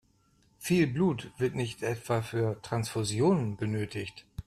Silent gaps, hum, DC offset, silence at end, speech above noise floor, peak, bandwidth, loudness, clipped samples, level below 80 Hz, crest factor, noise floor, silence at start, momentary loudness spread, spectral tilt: none; none; under 0.1%; 0.05 s; 37 dB; -14 dBFS; 14.5 kHz; -30 LUFS; under 0.1%; -58 dBFS; 16 dB; -67 dBFS; 0.6 s; 9 LU; -6 dB/octave